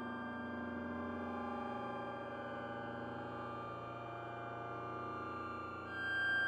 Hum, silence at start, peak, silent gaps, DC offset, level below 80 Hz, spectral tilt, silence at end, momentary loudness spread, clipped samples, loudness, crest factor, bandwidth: none; 0 s; -28 dBFS; none; under 0.1%; -72 dBFS; -6.5 dB/octave; 0 s; 4 LU; under 0.1%; -43 LUFS; 16 dB; 13.5 kHz